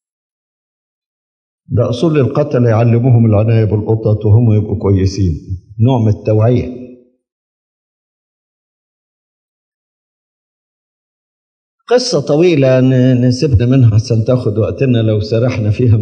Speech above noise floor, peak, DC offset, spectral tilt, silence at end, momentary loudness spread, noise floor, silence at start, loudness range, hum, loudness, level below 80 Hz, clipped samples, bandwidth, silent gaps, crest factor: 26 dB; 0 dBFS; under 0.1%; -8 dB/octave; 0 s; 6 LU; -36 dBFS; 1.7 s; 7 LU; none; -12 LUFS; -42 dBFS; under 0.1%; 8.6 kHz; 7.32-11.78 s; 12 dB